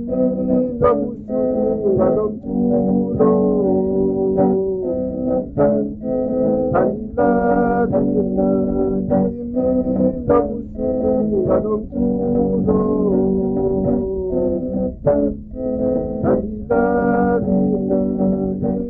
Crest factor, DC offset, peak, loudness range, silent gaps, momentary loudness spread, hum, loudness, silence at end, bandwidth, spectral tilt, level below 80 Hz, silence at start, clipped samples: 14 dB; under 0.1%; -4 dBFS; 2 LU; none; 5 LU; none; -18 LUFS; 0 s; 2.6 kHz; -13.5 dB/octave; -36 dBFS; 0 s; under 0.1%